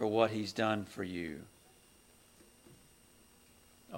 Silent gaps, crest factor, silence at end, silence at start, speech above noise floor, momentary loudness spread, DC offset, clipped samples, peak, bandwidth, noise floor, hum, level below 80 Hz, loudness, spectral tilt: none; 24 dB; 0 s; 0 s; 29 dB; 17 LU; under 0.1%; under 0.1%; -14 dBFS; 16.5 kHz; -63 dBFS; none; -70 dBFS; -35 LUFS; -5.5 dB/octave